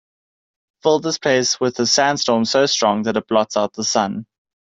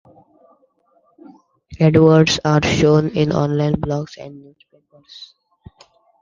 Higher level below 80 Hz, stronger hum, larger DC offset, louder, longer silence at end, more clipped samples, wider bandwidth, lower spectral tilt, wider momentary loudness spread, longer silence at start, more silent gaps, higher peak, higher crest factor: second, -62 dBFS vs -44 dBFS; neither; neither; second, -18 LUFS vs -15 LUFS; second, 0.4 s vs 0.95 s; neither; about the same, 8 kHz vs 7.4 kHz; second, -3 dB/octave vs -6.5 dB/octave; second, 6 LU vs 26 LU; second, 0.85 s vs 1.7 s; neither; about the same, -2 dBFS vs 0 dBFS; about the same, 16 dB vs 18 dB